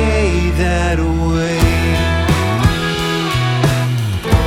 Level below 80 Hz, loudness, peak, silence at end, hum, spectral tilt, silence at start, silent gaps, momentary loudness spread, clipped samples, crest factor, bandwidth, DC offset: -22 dBFS; -15 LUFS; 0 dBFS; 0 s; none; -5.5 dB/octave; 0 s; none; 3 LU; under 0.1%; 14 dB; 16.5 kHz; under 0.1%